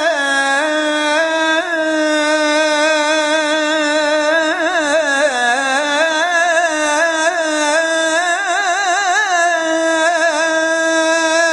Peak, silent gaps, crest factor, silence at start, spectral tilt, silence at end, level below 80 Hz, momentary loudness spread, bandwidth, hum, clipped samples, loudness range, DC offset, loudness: -2 dBFS; none; 12 dB; 0 s; 0 dB/octave; 0 s; -62 dBFS; 2 LU; 11.5 kHz; none; under 0.1%; 0 LU; under 0.1%; -14 LUFS